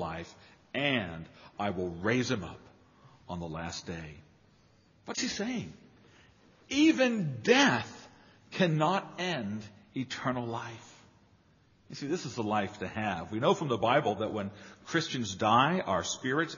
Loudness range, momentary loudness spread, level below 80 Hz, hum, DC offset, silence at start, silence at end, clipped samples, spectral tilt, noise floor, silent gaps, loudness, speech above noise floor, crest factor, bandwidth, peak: 10 LU; 18 LU; -64 dBFS; none; under 0.1%; 0 s; 0 s; under 0.1%; -3.5 dB/octave; -65 dBFS; none; -31 LUFS; 34 dB; 22 dB; 7.2 kHz; -10 dBFS